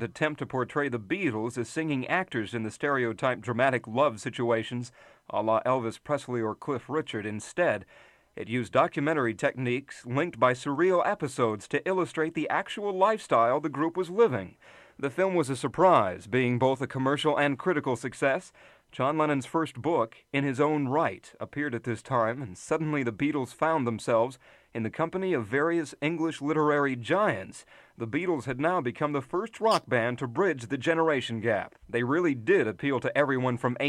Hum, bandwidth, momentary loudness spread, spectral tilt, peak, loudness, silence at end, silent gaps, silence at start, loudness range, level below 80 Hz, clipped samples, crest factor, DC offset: none; 12.5 kHz; 8 LU; -6 dB/octave; -8 dBFS; -28 LUFS; 0 s; none; 0 s; 3 LU; -68 dBFS; under 0.1%; 20 dB; under 0.1%